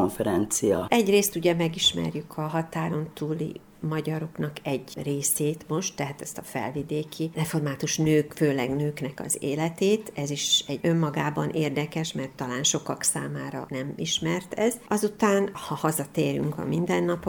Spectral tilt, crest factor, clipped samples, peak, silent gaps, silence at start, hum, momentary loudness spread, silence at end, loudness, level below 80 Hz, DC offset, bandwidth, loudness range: -4 dB/octave; 22 dB; under 0.1%; -4 dBFS; none; 0 s; none; 10 LU; 0 s; -27 LUFS; -58 dBFS; under 0.1%; over 20 kHz; 4 LU